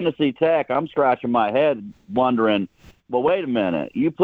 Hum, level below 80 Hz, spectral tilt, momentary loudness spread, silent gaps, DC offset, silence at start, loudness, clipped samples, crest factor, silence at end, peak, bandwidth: none; -60 dBFS; -8.5 dB/octave; 6 LU; none; under 0.1%; 0 s; -21 LUFS; under 0.1%; 14 dB; 0 s; -6 dBFS; 4.9 kHz